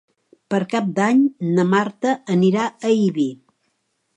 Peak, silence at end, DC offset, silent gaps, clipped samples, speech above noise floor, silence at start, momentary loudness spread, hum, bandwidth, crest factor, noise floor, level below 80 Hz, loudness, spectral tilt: -4 dBFS; 0.85 s; under 0.1%; none; under 0.1%; 52 dB; 0.5 s; 7 LU; none; 9.2 kHz; 16 dB; -70 dBFS; -70 dBFS; -19 LUFS; -7 dB/octave